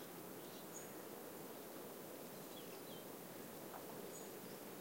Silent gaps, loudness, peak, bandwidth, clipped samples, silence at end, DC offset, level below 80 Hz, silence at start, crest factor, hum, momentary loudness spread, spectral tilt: none; -52 LUFS; -38 dBFS; 16 kHz; under 0.1%; 0 s; under 0.1%; -86 dBFS; 0 s; 16 dB; none; 1 LU; -3.5 dB/octave